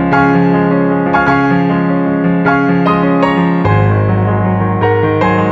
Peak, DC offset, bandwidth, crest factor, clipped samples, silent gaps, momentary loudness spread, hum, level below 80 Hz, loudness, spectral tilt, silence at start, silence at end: 0 dBFS; under 0.1%; 6 kHz; 10 dB; under 0.1%; none; 3 LU; none; -36 dBFS; -11 LUFS; -9 dB/octave; 0 s; 0 s